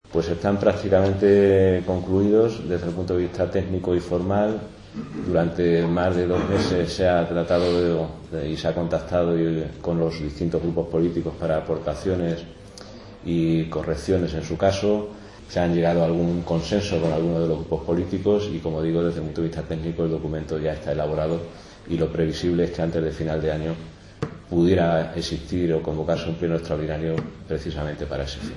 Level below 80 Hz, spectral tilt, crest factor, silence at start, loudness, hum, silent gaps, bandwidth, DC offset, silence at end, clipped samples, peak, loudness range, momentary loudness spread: -44 dBFS; -7.5 dB/octave; 18 dB; 0.1 s; -23 LUFS; none; none; 11 kHz; under 0.1%; 0 s; under 0.1%; -6 dBFS; 5 LU; 10 LU